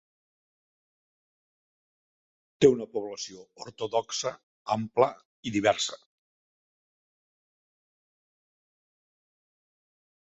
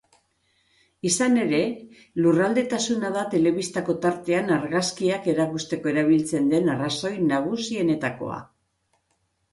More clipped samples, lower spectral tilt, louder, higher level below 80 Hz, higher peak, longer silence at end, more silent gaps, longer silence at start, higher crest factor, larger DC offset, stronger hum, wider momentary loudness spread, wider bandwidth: neither; second, -3.5 dB/octave vs -5 dB/octave; second, -28 LUFS vs -23 LUFS; about the same, -68 dBFS vs -64 dBFS; first, -6 dBFS vs -10 dBFS; first, 4.4 s vs 1.1 s; first, 4.43-4.65 s, 5.25-5.43 s vs none; first, 2.6 s vs 1.05 s; first, 26 dB vs 14 dB; neither; neither; first, 18 LU vs 8 LU; second, 8 kHz vs 11.5 kHz